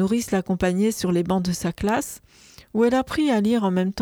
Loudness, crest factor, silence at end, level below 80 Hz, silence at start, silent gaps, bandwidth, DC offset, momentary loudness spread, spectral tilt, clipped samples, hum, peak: -22 LUFS; 14 dB; 0 s; -48 dBFS; 0 s; none; 19.5 kHz; under 0.1%; 6 LU; -6 dB/octave; under 0.1%; none; -8 dBFS